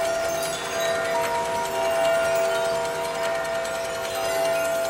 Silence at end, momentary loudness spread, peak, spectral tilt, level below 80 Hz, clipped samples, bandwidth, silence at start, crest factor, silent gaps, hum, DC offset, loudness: 0 s; 5 LU; -12 dBFS; -2 dB/octave; -56 dBFS; under 0.1%; 16.5 kHz; 0 s; 12 dB; none; none; under 0.1%; -24 LUFS